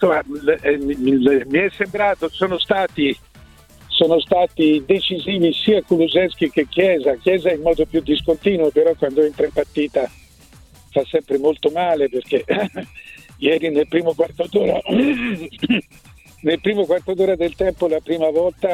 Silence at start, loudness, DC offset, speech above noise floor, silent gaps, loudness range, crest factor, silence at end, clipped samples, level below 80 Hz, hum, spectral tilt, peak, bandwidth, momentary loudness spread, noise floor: 0 s; -18 LUFS; under 0.1%; 29 dB; none; 3 LU; 16 dB; 0 s; under 0.1%; -46 dBFS; none; -6.5 dB/octave; -2 dBFS; 14 kHz; 6 LU; -47 dBFS